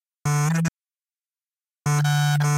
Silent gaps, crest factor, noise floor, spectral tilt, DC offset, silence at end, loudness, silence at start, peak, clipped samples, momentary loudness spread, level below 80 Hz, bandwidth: none; 12 dB; under -90 dBFS; -5 dB/octave; under 0.1%; 0 s; -23 LUFS; 0.25 s; -12 dBFS; under 0.1%; 7 LU; -58 dBFS; 15.5 kHz